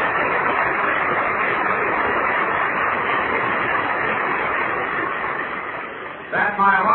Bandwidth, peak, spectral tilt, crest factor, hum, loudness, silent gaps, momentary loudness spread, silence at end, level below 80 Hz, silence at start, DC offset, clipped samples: 4.2 kHz; -4 dBFS; -8 dB/octave; 16 dB; none; -20 LUFS; none; 6 LU; 0 s; -52 dBFS; 0 s; under 0.1%; under 0.1%